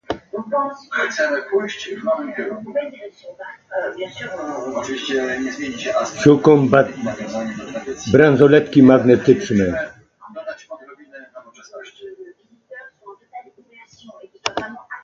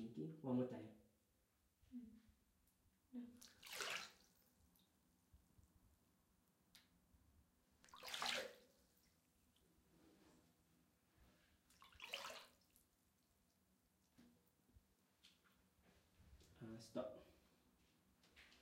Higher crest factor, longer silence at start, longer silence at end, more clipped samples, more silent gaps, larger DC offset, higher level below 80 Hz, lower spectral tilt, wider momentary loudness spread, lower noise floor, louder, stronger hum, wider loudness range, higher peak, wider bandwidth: second, 18 dB vs 28 dB; about the same, 0.1 s vs 0 s; about the same, 0.05 s vs 0 s; neither; neither; neither; first, -52 dBFS vs -82 dBFS; first, -6 dB/octave vs -3.5 dB/octave; first, 26 LU vs 21 LU; second, -48 dBFS vs -83 dBFS; first, -18 LUFS vs -51 LUFS; neither; first, 19 LU vs 8 LU; first, 0 dBFS vs -30 dBFS; second, 7.6 kHz vs 16 kHz